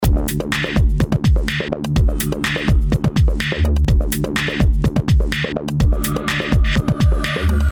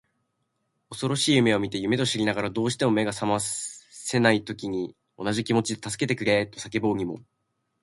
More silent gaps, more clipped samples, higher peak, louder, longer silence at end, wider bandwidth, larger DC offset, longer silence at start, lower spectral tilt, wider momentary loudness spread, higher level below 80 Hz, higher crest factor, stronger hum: neither; neither; about the same, -4 dBFS vs -4 dBFS; first, -18 LUFS vs -25 LUFS; second, 0 s vs 0.65 s; first, over 20 kHz vs 11.5 kHz; neither; second, 0 s vs 0.9 s; about the same, -5.5 dB/octave vs -4.5 dB/octave; second, 3 LU vs 11 LU; first, -20 dBFS vs -60 dBFS; second, 12 dB vs 22 dB; neither